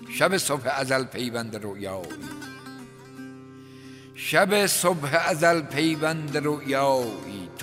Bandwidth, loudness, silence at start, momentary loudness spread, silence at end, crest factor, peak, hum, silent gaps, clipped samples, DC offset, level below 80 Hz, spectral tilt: 16 kHz; -24 LUFS; 0 s; 22 LU; 0 s; 22 dB; -4 dBFS; none; none; under 0.1%; under 0.1%; -66 dBFS; -3.5 dB/octave